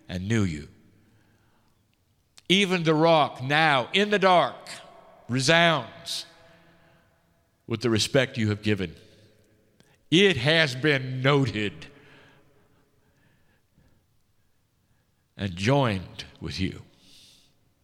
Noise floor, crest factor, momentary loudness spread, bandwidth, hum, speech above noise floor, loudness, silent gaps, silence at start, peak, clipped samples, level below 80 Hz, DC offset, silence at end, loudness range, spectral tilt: -68 dBFS; 24 dB; 16 LU; 15.5 kHz; none; 44 dB; -23 LUFS; none; 0.1 s; -4 dBFS; under 0.1%; -58 dBFS; under 0.1%; 1 s; 9 LU; -5 dB/octave